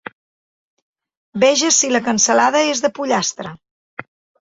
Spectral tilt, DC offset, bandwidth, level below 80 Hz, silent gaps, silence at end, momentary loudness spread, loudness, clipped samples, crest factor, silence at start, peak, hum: -2 dB/octave; under 0.1%; 8 kHz; -62 dBFS; 3.71-3.97 s; 0.4 s; 22 LU; -15 LUFS; under 0.1%; 18 dB; 1.35 s; -2 dBFS; none